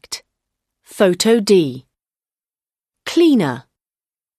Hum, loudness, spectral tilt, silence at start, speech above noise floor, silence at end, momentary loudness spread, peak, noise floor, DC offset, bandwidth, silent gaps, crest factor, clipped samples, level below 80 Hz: none; -15 LUFS; -5 dB/octave; 0.1 s; over 76 dB; 0.8 s; 18 LU; -2 dBFS; under -90 dBFS; under 0.1%; 13.5 kHz; none; 18 dB; under 0.1%; -62 dBFS